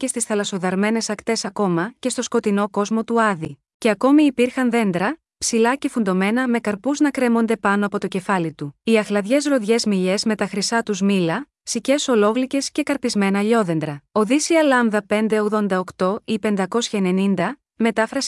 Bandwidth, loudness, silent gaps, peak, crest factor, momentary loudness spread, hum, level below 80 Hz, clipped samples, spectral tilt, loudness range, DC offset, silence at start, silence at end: 12 kHz; -20 LUFS; 3.74-3.80 s; -4 dBFS; 14 dB; 6 LU; none; -62 dBFS; under 0.1%; -4.5 dB/octave; 2 LU; under 0.1%; 0 s; 0 s